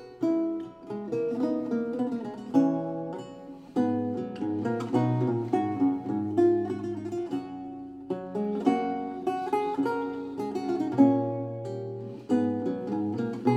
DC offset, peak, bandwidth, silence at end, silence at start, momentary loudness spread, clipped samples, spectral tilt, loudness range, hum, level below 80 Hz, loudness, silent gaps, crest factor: under 0.1%; -8 dBFS; 8.6 kHz; 0 s; 0 s; 12 LU; under 0.1%; -8.5 dB/octave; 3 LU; none; -68 dBFS; -29 LUFS; none; 20 dB